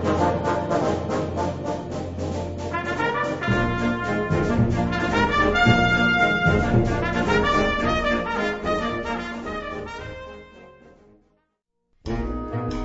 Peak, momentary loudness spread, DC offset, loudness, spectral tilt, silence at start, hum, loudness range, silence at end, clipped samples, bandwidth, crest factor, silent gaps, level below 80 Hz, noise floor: -6 dBFS; 13 LU; 0.2%; -23 LUFS; -6 dB/octave; 0 s; none; 13 LU; 0 s; under 0.1%; 8 kHz; 18 dB; none; -36 dBFS; -75 dBFS